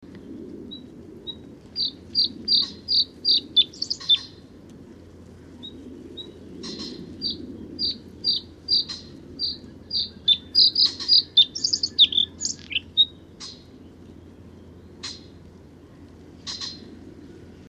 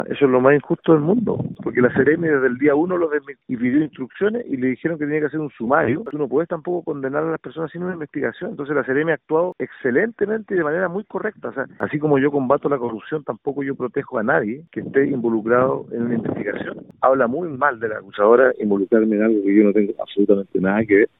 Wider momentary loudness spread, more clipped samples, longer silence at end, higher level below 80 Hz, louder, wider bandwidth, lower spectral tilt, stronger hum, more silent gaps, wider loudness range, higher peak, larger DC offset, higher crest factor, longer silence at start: first, 23 LU vs 11 LU; neither; about the same, 0.1 s vs 0.15 s; about the same, -56 dBFS vs -58 dBFS; about the same, -20 LUFS vs -20 LUFS; first, 12.5 kHz vs 4 kHz; second, -1.5 dB/octave vs -11.5 dB/octave; neither; neither; first, 20 LU vs 5 LU; second, -6 dBFS vs -2 dBFS; neither; about the same, 22 dB vs 18 dB; about the same, 0 s vs 0 s